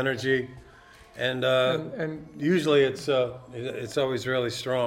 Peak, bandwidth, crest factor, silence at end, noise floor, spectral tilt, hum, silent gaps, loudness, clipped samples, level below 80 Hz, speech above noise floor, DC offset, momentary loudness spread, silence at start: -10 dBFS; 16 kHz; 16 dB; 0 s; -52 dBFS; -5.5 dB/octave; none; none; -26 LUFS; under 0.1%; -60 dBFS; 25 dB; under 0.1%; 12 LU; 0 s